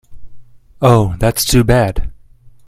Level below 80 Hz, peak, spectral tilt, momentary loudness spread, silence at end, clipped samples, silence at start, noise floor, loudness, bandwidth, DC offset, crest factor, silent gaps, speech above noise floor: -26 dBFS; 0 dBFS; -5.5 dB/octave; 12 LU; 0.2 s; under 0.1%; 0.1 s; -41 dBFS; -13 LUFS; 15.5 kHz; under 0.1%; 14 dB; none; 30 dB